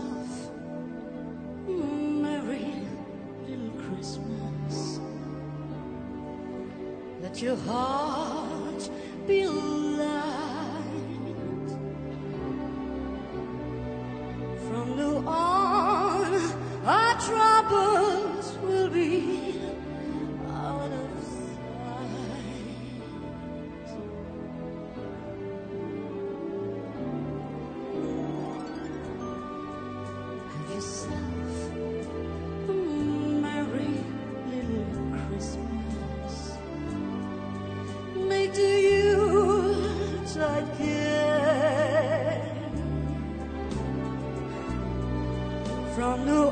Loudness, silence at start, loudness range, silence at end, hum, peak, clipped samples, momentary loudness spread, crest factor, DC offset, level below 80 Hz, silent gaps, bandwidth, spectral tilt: -30 LUFS; 0 s; 12 LU; 0 s; none; -10 dBFS; under 0.1%; 14 LU; 20 dB; under 0.1%; -46 dBFS; none; 9.4 kHz; -6 dB/octave